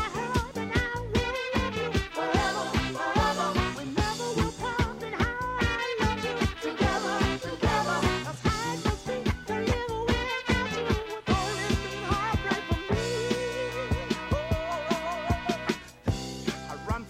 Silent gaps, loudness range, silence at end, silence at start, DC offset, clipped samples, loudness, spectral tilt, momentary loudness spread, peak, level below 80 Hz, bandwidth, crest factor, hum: none; 2 LU; 0 s; 0 s; under 0.1%; under 0.1%; -29 LUFS; -5 dB/octave; 4 LU; -12 dBFS; -40 dBFS; 16 kHz; 18 dB; none